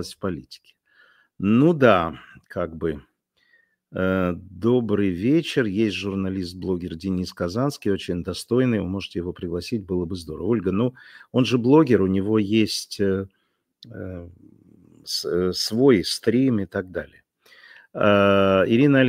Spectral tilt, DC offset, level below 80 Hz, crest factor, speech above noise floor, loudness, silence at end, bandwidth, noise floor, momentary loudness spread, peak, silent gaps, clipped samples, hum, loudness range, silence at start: -6 dB/octave; under 0.1%; -54 dBFS; 20 dB; 42 dB; -22 LUFS; 0 s; 16 kHz; -64 dBFS; 16 LU; -2 dBFS; none; under 0.1%; none; 5 LU; 0 s